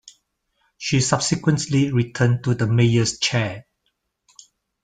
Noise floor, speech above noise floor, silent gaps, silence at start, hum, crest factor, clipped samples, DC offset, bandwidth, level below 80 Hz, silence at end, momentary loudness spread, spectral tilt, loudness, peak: -73 dBFS; 54 dB; none; 0.8 s; none; 20 dB; under 0.1%; under 0.1%; 9.4 kHz; -52 dBFS; 1.2 s; 6 LU; -5 dB/octave; -20 LUFS; -2 dBFS